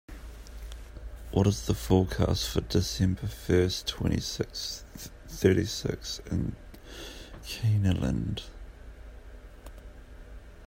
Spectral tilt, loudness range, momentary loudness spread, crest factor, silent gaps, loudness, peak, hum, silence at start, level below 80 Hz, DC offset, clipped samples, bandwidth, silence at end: -5.5 dB/octave; 5 LU; 23 LU; 22 dB; none; -29 LUFS; -8 dBFS; none; 0.1 s; -42 dBFS; under 0.1%; under 0.1%; 16 kHz; 0 s